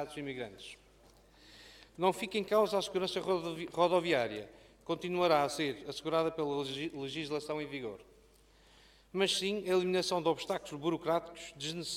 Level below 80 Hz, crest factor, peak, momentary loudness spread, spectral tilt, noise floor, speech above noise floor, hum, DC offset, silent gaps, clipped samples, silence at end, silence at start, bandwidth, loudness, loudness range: -68 dBFS; 20 dB; -14 dBFS; 15 LU; -4 dB/octave; -63 dBFS; 29 dB; none; under 0.1%; none; under 0.1%; 0 s; 0 s; 16 kHz; -34 LUFS; 5 LU